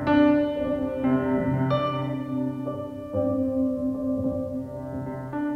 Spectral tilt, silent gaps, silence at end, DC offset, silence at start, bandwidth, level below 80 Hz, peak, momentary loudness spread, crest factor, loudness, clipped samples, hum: -9 dB/octave; none; 0 s; under 0.1%; 0 s; 5.8 kHz; -50 dBFS; -8 dBFS; 11 LU; 16 dB; -26 LUFS; under 0.1%; none